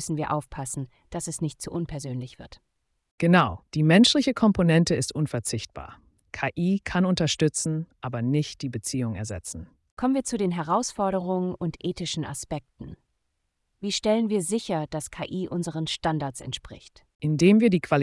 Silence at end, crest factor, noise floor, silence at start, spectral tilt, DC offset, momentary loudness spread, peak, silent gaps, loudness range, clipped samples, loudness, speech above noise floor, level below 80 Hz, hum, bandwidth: 0 s; 18 dB; -76 dBFS; 0 s; -5 dB/octave; under 0.1%; 15 LU; -8 dBFS; 3.11-3.18 s, 9.91-9.97 s, 17.15-17.19 s; 8 LU; under 0.1%; -25 LUFS; 51 dB; -52 dBFS; none; 12 kHz